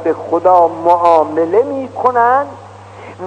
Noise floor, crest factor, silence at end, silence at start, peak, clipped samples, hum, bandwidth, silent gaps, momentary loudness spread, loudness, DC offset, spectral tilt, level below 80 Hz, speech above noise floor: -33 dBFS; 14 dB; 0 s; 0 s; 0 dBFS; 0.4%; none; 9.2 kHz; none; 6 LU; -12 LUFS; under 0.1%; -7 dB/octave; -60 dBFS; 21 dB